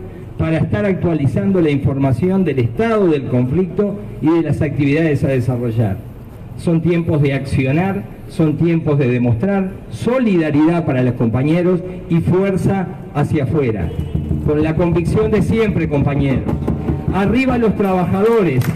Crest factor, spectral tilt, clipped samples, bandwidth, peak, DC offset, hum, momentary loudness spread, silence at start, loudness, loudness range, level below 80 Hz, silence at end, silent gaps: 8 dB; -8.5 dB/octave; under 0.1%; 14 kHz; -6 dBFS; under 0.1%; none; 6 LU; 0 s; -16 LUFS; 2 LU; -34 dBFS; 0 s; none